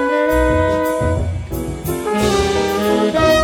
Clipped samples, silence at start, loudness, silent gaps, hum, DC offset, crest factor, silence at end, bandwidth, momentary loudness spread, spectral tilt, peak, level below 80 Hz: under 0.1%; 0 s; -17 LUFS; none; none; under 0.1%; 16 dB; 0 s; 19.5 kHz; 8 LU; -5.5 dB/octave; 0 dBFS; -28 dBFS